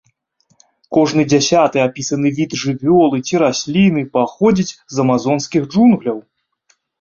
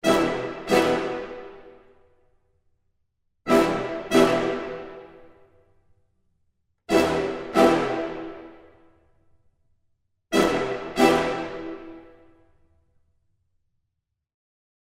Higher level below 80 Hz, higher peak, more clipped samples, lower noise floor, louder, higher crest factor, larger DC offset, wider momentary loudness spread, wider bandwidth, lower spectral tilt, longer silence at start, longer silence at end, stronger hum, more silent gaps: about the same, -52 dBFS vs -54 dBFS; about the same, -2 dBFS vs -4 dBFS; neither; second, -61 dBFS vs -80 dBFS; first, -15 LUFS vs -23 LUFS; second, 14 dB vs 22 dB; neither; second, 6 LU vs 19 LU; second, 7.6 kHz vs 16 kHz; about the same, -5.5 dB/octave vs -4.5 dB/octave; first, 0.9 s vs 0.05 s; second, 0.8 s vs 2.75 s; neither; neither